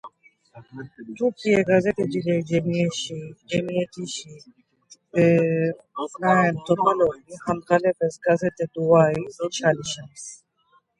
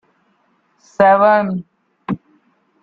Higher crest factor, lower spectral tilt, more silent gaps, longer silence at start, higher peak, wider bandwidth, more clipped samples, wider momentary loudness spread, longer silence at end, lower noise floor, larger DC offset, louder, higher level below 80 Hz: about the same, 20 dB vs 16 dB; second, -6 dB/octave vs -7.5 dB/octave; neither; second, 0.05 s vs 1 s; about the same, -4 dBFS vs -2 dBFS; first, 11 kHz vs 7.2 kHz; neither; second, 17 LU vs 21 LU; about the same, 0.65 s vs 0.65 s; about the same, -63 dBFS vs -61 dBFS; neither; second, -23 LUFS vs -15 LUFS; about the same, -60 dBFS vs -58 dBFS